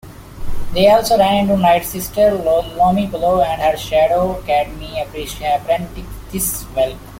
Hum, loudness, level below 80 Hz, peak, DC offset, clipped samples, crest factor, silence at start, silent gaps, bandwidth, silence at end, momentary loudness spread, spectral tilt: none; -16 LUFS; -32 dBFS; -2 dBFS; under 0.1%; under 0.1%; 14 dB; 0.05 s; none; 16.5 kHz; 0 s; 13 LU; -4.5 dB/octave